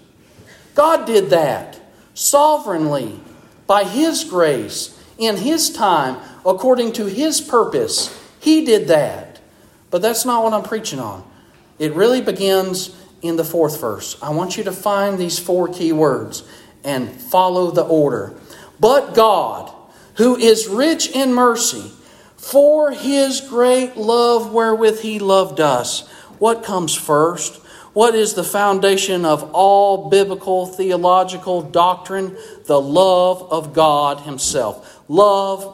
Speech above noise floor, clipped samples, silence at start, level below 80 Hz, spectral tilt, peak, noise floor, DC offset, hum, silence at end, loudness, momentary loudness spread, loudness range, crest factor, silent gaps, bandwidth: 33 dB; under 0.1%; 0.75 s; -58 dBFS; -3.5 dB/octave; 0 dBFS; -48 dBFS; under 0.1%; none; 0 s; -16 LUFS; 11 LU; 4 LU; 16 dB; none; 16.5 kHz